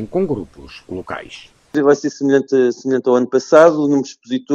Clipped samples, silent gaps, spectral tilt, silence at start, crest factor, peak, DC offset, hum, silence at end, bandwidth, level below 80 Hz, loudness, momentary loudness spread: under 0.1%; none; -6 dB/octave; 0 s; 16 dB; 0 dBFS; under 0.1%; none; 0 s; 8.6 kHz; -52 dBFS; -15 LUFS; 19 LU